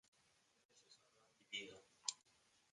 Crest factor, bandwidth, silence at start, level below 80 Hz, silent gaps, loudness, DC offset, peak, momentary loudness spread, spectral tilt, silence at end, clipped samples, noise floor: 36 dB; 11 kHz; 0.75 s; under -90 dBFS; none; -50 LUFS; under 0.1%; -22 dBFS; 21 LU; 0.5 dB/octave; 0.55 s; under 0.1%; -78 dBFS